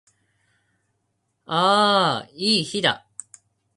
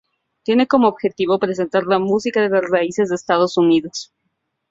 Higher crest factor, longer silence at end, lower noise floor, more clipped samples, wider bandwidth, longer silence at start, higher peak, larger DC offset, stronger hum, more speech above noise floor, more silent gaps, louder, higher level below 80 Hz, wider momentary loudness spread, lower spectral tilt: about the same, 22 dB vs 18 dB; first, 0.8 s vs 0.65 s; about the same, -73 dBFS vs -72 dBFS; neither; first, 11.5 kHz vs 7.8 kHz; first, 1.5 s vs 0.5 s; second, -4 dBFS vs 0 dBFS; neither; neither; about the same, 53 dB vs 56 dB; neither; second, -20 LUFS vs -17 LUFS; second, -68 dBFS vs -62 dBFS; first, 16 LU vs 6 LU; second, -3.5 dB/octave vs -5.5 dB/octave